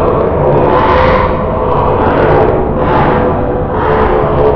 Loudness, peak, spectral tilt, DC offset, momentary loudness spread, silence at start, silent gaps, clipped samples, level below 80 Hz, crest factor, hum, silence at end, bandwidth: -10 LUFS; 0 dBFS; -9.5 dB/octave; under 0.1%; 4 LU; 0 s; none; 0.5%; -20 dBFS; 10 dB; none; 0 s; 5.4 kHz